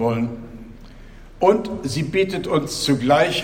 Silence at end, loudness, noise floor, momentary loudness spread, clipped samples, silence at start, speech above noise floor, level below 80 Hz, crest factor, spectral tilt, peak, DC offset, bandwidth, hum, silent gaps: 0 s; -20 LUFS; -41 dBFS; 15 LU; under 0.1%; 0 s; 21 dB; -44 dBFS; 18 dB; -5 dB/octave; -2 dBFS; under 0.1%; 16.5 kHz; none; none